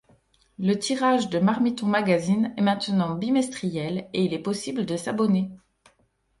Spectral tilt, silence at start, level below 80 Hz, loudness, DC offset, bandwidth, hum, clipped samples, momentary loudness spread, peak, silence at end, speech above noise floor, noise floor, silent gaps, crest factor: -6 dB/octave; 0.6 s; -62 dBFS; -25 LUFS; under 0.1%; 11.5 kHz; none; under 0.1%; 7 LU; -8 dBFS; 0.85 s; 44 dB; -67 dBFS; none; 16 dB